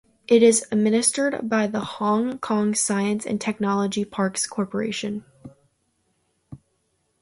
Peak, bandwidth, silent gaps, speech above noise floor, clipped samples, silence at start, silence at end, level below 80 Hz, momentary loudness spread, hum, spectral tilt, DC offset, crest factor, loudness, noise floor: -4 dBFS; 11.5 kHz; none; 48 dB; under 0.1%; 0.3 s; 0.65 s; -64 dBFS; 9 LU; none; -4 dB/octave; under 0.1%; 20 dB; -22 LUFS; -70 dBFS